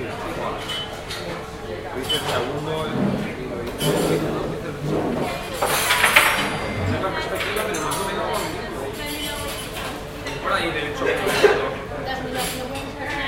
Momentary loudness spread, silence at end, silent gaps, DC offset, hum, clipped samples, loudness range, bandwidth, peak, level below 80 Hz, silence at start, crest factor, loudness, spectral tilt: 12 LU; 0 s; none; under 0.1%; none; under 0.1%; 6 LU; 16.5 kHz; 0 dBFS; -42 dBFS; 0 s; 24 dB; -23 LUFS; -3.5 dB/octave